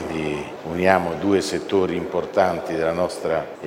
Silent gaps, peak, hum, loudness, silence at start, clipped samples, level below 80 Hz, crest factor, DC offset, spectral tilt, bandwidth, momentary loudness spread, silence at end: none; 0 dBFS; none; -22 LUFS; 0 s; under 0.1%; -52 dBFS; 22 dB; under 0.1%; -5.5 dB/octave; 16 kHz; 7 LU; 0 s